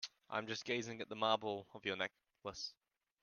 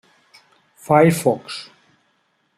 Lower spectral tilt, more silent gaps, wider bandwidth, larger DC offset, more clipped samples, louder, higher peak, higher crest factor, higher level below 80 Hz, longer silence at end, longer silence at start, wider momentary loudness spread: second, -3.5 dB/octave vs -6 dB/octave; neither; second, 10.5 kHz vs 16 kHz; neither; neither; second, -42 LUFS vs -17 LUFS; second, -18 dBFS vs -2 dBFS; about the same, 24 dB vs 20 dB; second, -82 dBFS vs -62 dBFS; second, 0.5 s vs 0.95 s; second, 0 s vs 0.9 s; second, 11 LU vs 18 LU